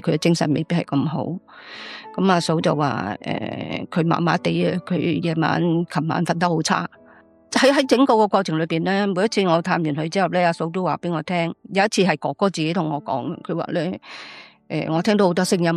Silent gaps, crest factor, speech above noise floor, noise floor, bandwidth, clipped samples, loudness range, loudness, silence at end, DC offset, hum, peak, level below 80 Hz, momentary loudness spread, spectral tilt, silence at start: none; 18 dB; 30 dB; -51 dBFS; 13 kHz; under 0.1%; 4 LU; -21 LUFS; 0 s; under 0.1%; none; -4 dBFS; -64 dBFS; 10 LU; -5.5 dB/octave; 0.05 s